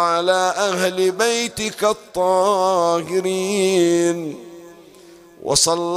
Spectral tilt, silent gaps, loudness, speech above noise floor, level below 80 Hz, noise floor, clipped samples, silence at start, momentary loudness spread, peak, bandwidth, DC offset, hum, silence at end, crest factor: -3 dB/octave; none; -18 LUFS; 27 dB; -54 dBFS; -45 dBFS; under 0.1%; 0 s; 6 LU; -4 dBFS; 16 kHz; under 0.1%; none; 0 s; 16 dB